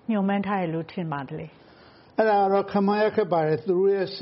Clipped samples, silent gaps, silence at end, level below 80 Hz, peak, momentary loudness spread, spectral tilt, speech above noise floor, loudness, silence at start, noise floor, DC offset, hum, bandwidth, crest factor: under 0.1%; none; 0 s; -66 dBFS; -8 dBFS; 11 LU; -5.5 dB/octave; 28 dB; -24 LUFS; 0.1 s; -52 dBFS; under 0.1%; none; 5.8 kHz; 18 dB